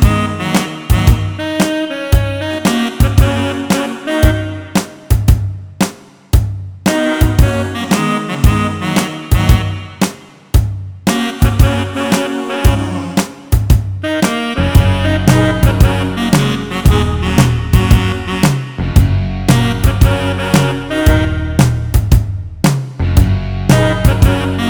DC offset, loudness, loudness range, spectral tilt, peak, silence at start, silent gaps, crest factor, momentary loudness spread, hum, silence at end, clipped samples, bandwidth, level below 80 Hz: under 0.1%; -14 LUFS; 3 LU; -6 dB/octave; 0 dBFS; 0 s; none; 12 dB; 7 LU; none; 0 s; 0.5%; over 20 kHz; -18 dBFS